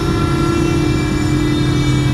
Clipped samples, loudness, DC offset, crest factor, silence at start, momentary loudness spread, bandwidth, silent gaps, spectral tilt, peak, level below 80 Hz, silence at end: under 0.1%; -15 LUFS; under 0.1%; 12 dB; 0 s; 1 LU; 13.5 kHz; none; -6.5 dB/octave; -4 dBFS; -24 dBFS; 0 s